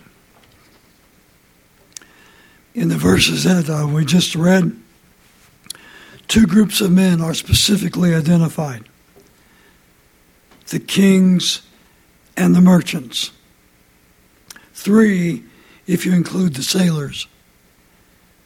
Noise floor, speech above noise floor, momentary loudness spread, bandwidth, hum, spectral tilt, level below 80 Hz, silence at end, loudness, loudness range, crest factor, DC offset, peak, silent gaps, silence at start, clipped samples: -53 dBFS; 39 dB; 18 LU; 16 kHz; none; -5 dB/octave; -42 dBFS; 1.2 s; -15 LUFS; 5 LU; 18 dB; under 0.1%; 0 dBFS; none; 2.75 s; under 0.1%